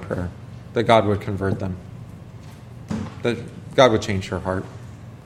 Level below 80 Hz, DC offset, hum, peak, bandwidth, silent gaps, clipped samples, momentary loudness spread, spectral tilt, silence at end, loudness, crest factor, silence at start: -48 dBFS; under 0.1%; none; 0 dBFS; 13 kHz; none; under 0.1%; 23 LU; -6 dB/octave; 0 s; -22 LUFS; 22 dB; 0 s